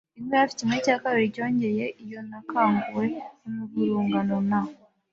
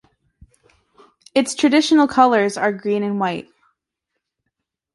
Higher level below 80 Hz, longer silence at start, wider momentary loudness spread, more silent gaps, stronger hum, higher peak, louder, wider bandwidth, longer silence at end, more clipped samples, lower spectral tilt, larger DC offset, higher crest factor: about the same, -64 dBFS vs -62 dBFS; second, 0.15 s vs 1.35 s; first, 13 LU vs 8 LU; neither; neither; second, -8 dBFS vs -2 dBFS; second, -25 LUFS vs -17 LUFS; second, 7.8 kHz vs 11.5 kHz; second, 0.4 s vs 1.55 s; neither; first, -6 dB/octave vs -4.5 dB/octave; neither; about the same, 18 dB vs 18 dB